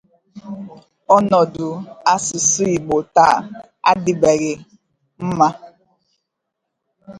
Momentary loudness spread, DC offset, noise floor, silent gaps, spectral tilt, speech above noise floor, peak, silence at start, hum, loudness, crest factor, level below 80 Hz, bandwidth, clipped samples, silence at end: 19 LU; under 0.1%; -78 dBFS; none; -4 dB/octave; 61 dB; 0 dBFS; 0.35 s; none; -17 LUFS; 18 dB; -54 dBFS; 11.5 kHz; under 0.1%; 0 s